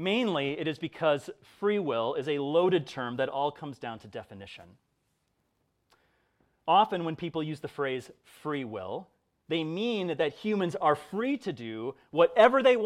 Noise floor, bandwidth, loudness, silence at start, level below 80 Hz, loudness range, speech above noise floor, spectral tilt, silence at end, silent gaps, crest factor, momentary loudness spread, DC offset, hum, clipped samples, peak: -76 dBFS; 12 kHz; -29 LUFS; 0 s; -72 dBFS; 7 LU; 47 dB; -6 dB/octave; 0 s; none; 24 dB; 16 LU; under 0.1%; none; under 0.1%; -6 dBFS